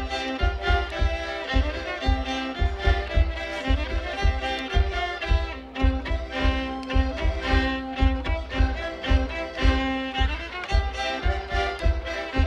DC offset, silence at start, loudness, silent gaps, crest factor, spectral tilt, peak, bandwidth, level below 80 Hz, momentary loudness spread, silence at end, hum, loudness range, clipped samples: under 0.1%; 0 s; -26 LUFS; none; 16 dB; -6 dB/octave; -8 dBFS; 8 kHz; -26 dBFS; 5 LU; 0 s; none; 1 LU; under 0.1%